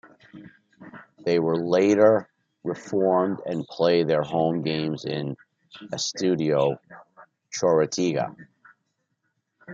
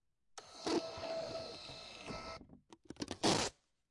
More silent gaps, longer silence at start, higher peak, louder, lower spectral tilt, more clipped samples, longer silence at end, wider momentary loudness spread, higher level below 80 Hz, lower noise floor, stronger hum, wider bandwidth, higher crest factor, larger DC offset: neither; about the same, 0.35 s vs 0.35 s; first, -4 dBFS vs -18 dBFS; first, -24 LUFS vs -40 LUFS; first, -5.5 dB/octave vs -3 dB/octave; neither; second, 0 s vs 0.4 s; second, 14 LU vs 21 LU; about the same, -68 dBFS vs -66 dBFS; first, -76 dBFS vs -61 dBFS; neither; second, 7.8 kHz vs 11.5 kHz; about the same, 20 dB vs 24 dB; neither